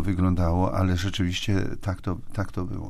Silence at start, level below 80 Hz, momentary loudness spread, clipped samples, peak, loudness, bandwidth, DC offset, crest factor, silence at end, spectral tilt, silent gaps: 0 s; -36 dBFS; 8 LU; under 0.1%; -12 dBFS; -26 LUFS; 13.5 kHz; under 0.1%; 14 dB; 0 s; -6.5 dB/octave; none